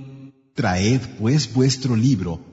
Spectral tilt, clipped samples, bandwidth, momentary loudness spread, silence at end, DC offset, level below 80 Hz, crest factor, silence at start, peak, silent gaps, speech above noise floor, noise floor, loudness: -5.5 dB/octave; under 0.1%; 8 kHz; 6 LU; 0 s; under 0.1%; -48 dBFS; 14 dB; 0 s; -6 dBFS; none; 23 dB; -42 dBFS; -20 LUFS